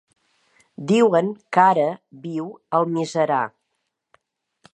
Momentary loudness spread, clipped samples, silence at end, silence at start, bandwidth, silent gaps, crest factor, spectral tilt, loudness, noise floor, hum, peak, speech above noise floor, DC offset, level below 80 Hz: 14 LU; under 0.1%; 1.25 s; 0.8 s; 11 kHz; none; 22 dB; -6 dB/octave; -20 LUFS; -76 dBFS; none; -2 dBFS; 56 dB; under 0.1%; -76 dBFS